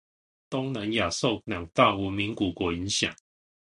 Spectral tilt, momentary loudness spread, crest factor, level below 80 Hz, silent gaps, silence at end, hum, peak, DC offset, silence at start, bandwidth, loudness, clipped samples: -4 dB/octave; 9 LU; 24 dB; -50 dBFS; none; 0.65 s; none; -6 dBFS; under 0.1%; 0.5 s; 11.5 kHz; -27 LUFS; under 0.1%